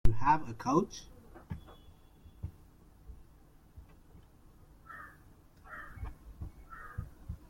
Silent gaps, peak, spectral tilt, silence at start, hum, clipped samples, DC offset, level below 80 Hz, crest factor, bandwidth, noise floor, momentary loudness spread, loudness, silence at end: none; -10 dBFS; -6.5 dB/octave; 0.05 s; none; under 0.1%; under 0.1%; -46 dBFS; 24 dB; 7 kHz; -59 dBFS; 27 LU; -37 LUFS; 0.15 s